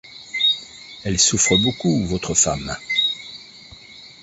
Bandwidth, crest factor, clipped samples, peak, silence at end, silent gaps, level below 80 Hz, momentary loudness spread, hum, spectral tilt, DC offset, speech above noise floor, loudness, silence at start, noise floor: 8.2 kHz; 18 dB; under 0.1%; -4 dBFS; 0.1 s; none; -44 dBFS; 19 LU; none; -2.5 dB/octave; under 0.1%; 24 dB; -18 LUFS; 0.05 s; -43 dBFS